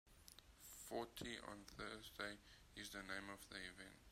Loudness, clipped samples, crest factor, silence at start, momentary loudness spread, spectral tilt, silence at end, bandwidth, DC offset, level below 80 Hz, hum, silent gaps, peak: -53 LUFS; under 0.1%; 24 dB; 0.05 s; 11 LU; -3 dB/octave; 0 s; 16 kHz; under 0.1%; -70 dBFS; none; none; -32 dBFS